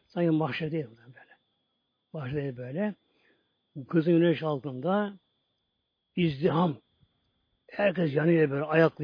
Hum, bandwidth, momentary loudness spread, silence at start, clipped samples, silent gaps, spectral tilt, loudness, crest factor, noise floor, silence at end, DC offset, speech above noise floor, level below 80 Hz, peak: none; 5.2 kHz; 16 LU; 0.15 s; under 0.1%; none; -10 dB/octave; -28 LUFS; 20 dB; -80 dBFS; 0 s; under 0.1%; 53 dB; -66 dBFS; -8 dBFS